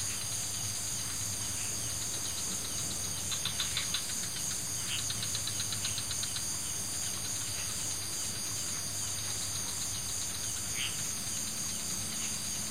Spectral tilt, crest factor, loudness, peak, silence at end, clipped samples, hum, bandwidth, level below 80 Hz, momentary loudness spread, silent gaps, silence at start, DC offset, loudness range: -1 dB/octave; 20 dB; -33 LUFS; -16 dBFS; 0 s; under 0.1%; none; 16 kHz; -56 dBFS; 2 LU; none; 0 s; 0.6%; 1 LU